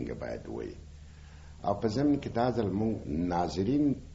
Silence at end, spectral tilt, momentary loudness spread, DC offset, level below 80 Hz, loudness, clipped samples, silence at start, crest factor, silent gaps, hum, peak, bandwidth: 0 s; -7 dB/octave; 23 LU; under 0.1%; -48 dBFS; -31 LUFS; under 0.1%; 0 s; 16 dB; none; none; -14 dBFS; 7.6 kHz